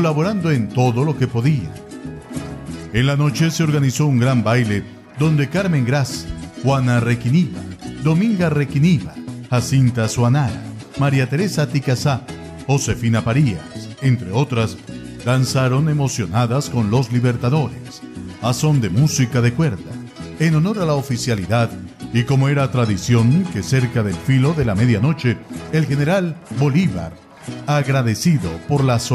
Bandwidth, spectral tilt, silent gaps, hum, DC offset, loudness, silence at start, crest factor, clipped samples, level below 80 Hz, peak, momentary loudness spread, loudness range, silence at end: 14 kHz; -6.5 dB/octave; none; none; under 0.1%; -18 LUFS; 0 s; 12 dB; under 0.1%; -42 dBFS; -4 dBFS; 14 LU; 2 LU; 0 s